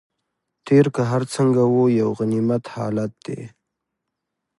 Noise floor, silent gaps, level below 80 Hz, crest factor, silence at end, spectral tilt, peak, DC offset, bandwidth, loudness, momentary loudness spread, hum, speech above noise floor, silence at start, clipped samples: -80 dBFS; none; -62 dBFS; 16 dB; 1.1 s; -7.5 dB/octave; -4 dBFS; under 0.1%; 11.5 kHz; -20 LUFS; 13 LU; none; 61 dB; 0.65 s; under 0.1%